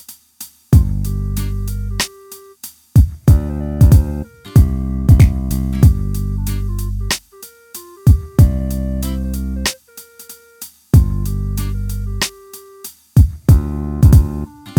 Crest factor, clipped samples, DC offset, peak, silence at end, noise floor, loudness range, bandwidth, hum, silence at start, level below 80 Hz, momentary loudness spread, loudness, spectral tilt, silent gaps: 14 dB; under 0.1%; under 0.1%; 0 dBFS; 0 s; -41 dBFS; 6 LU; 19 kHz; none; 0.1 s; -20 dBFS; 23 LU; -16 LUFS; -6 dB/octave; none